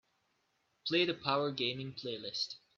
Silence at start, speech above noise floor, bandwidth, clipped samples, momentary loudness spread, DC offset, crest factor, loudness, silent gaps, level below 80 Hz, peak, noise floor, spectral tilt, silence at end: 0.85 s; 43 dB; 7.4 kHz; under 0.1%; 10 LU; under 0.1%; 22 dB; -35 LUFS; none; -78 dBFS; -16 dBFS; -78 dBFS; -4.5 dB/octave; 0.2 s